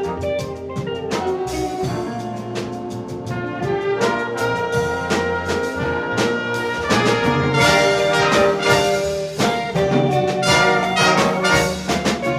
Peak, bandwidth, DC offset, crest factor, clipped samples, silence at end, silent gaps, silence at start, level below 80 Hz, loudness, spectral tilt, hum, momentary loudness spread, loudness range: -2 dBFS; 15.5 kHz; under 0.1%; 18 dB; under 0.1%; 0 s; none; 0 s; -42 dBFS; -19 LUFS; -4.5 dB/octave; none; 12 LU; 8 LU